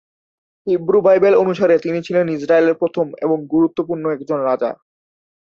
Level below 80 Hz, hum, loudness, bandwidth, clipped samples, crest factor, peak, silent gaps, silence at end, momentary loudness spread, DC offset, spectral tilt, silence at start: -62 dBFS; none; -17 LUFS; 7 kHz; under 0.1%; 14 dB; -2 dBFS; none; 0.85 s; 9 LU; under 0.1%; -8 dB/octave; 0.65 s